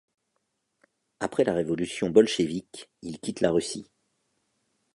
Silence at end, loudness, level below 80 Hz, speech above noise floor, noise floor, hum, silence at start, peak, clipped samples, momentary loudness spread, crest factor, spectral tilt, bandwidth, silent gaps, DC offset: 1.1 s; -26 LUFS; -60 dBFS; 52 dB; -78 dBFS; none; 1.2 s; -4 dBFS; under 0.1%; 18 LU; 24 dB; -5 dB/octave; 11.5 kHz; none; under 0.1%